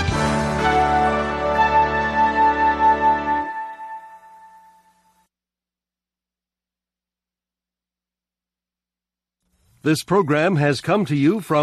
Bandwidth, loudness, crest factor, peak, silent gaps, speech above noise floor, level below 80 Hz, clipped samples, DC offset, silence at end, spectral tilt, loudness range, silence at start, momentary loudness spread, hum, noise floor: 13.5 kHz; -19 LUFS; 16 dB; -6 dBFS; none; 71 dB; -40 dBFS; under 0.1%; under 0.1%; 0 s; -6 dB/octave; 13 LU; 0 s; 11 LU; 60 Hz at -75 dBFS; -89 dBFS